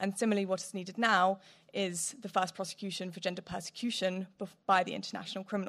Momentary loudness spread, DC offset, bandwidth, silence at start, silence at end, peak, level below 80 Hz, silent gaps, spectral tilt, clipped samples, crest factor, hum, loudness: 12 LU; under 0.1%; 14.5 kHz; 0 s; 0 s; -12 dBFS; -74 dBFS; none; -3.5 dB/octave; under 0.1%; 22 dB; none; -34 LUFS